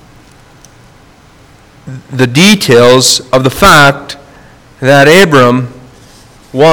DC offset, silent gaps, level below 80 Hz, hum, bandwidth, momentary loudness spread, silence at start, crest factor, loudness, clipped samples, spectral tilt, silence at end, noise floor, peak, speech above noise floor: under 0.1%; none; -36 dBFS; none; over 20 kHz; 21 LU; 1.85 s; 8 dB; -5 LUFS; 4%; -4 dB/octave; 0 s; -39 dBFS; 0 dBFS; 34 dB